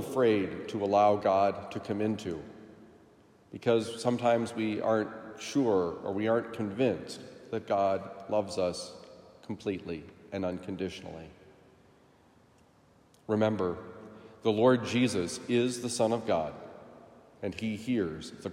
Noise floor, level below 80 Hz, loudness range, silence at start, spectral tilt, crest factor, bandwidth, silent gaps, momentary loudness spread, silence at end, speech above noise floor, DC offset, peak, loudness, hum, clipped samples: -62 dBFS; -70 dBFS; 10 LU; 0 s; -5.5 dB/octave; 20 dB; 15.5 kHz; none; 18 LU; 0 s; 33 dB; under 0.1%; -12 dBFS; -31 LUFS; none; under 0.1%